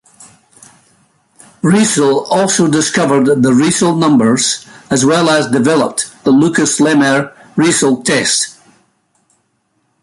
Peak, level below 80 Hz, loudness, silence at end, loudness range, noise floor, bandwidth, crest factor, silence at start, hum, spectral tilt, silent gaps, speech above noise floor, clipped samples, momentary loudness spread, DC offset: 0 dBFS; -52 dBFS; -12 LUFS; 1.5 s; 3 LU; -62 dBFS; 11.5 kHz; 12 dB; 1.65 s; none; -4 dB/octave; none; 51 dB; under 0.1%; 6 LU; under 0.1%